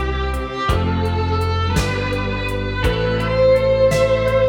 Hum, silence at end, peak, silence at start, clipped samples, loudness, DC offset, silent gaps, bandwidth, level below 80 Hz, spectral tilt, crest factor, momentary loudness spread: none; 0 s; -4 dBFS; 0 s; under 0.1%; -18 LUFS; under 0.1%; none; 17.5 kHz; -28 dBFS; -6 dB/octave; 12 dB; 7 LU